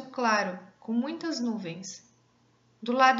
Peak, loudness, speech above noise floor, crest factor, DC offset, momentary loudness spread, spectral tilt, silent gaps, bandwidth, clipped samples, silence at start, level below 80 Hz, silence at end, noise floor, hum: -8 dBFS; -30 LUFS; 38 dB; 22 dB; under 0.1%; 16 LU; -4 dB/octave; none; 7.8 kHz; under 0.1%; 0 s; -84 dBFS; 0 s; -65 dBFS; none